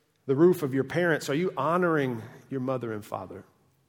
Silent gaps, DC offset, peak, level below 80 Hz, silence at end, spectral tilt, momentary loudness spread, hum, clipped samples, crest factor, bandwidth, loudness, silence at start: none; under 0.1%; -10 dBFS; -72 dBFS; 0.45 s; -6.5 dB/octave; 15 LU; none; under 0.1%; 16 dB; 18 kHz; -27 LUFS; 0.25 s